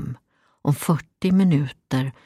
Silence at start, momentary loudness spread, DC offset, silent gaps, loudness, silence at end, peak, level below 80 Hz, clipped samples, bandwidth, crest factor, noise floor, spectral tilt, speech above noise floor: 0 s; 12 LU; under 0.1%; none; -22 LUFS; 0.15 s; -6 dBFS; -56 dBFS; under 0.1%; 15 kHz; 16 dB; -57 dBFS; -7 dB/octave; 36 dB